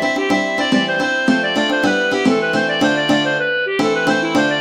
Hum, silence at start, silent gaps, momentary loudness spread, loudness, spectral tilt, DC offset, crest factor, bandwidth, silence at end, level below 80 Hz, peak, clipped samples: none; 0 s; none; 2 LU; -16 LUFS; -4 dB/octave; under 0.1%; 14 dB; 15 kHz; 0 s; -56 dBFS; -2 dBFS; under 0.1%